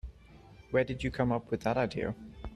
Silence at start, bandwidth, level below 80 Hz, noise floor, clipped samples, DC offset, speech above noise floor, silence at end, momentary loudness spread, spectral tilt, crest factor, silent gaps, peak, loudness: 0.05 s; 12 kHz; -50 dBFS; -55 dBFS; under 0.1%; under 0.1%; 23 dB; 0 s; 9 LU; -7.5 dB/octave; 20 dB; none; -14 dBFS; -32 LUFS